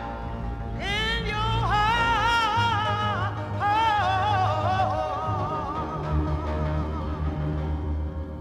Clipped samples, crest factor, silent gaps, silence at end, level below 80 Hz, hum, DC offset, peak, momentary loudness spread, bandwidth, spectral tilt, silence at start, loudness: under 0.1%; 14 dB; none; 0 s; -36 dBFS; none; under 0.1%; -12 dBFS; 9 LU; 13 kHz; -5.5 dB/octave; 0 s; -25 LUFS